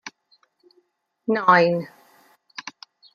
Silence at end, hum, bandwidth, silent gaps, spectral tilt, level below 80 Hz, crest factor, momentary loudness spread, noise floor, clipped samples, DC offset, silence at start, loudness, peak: 0.45 s; none; 7 kHz; none; -6 dB/octave; -72 dBFS; 22 dB; 24 LU; -66 dBFS; under 0.1%; under 0.1%; 0.05 s; -19 LUFS; -2 dBFS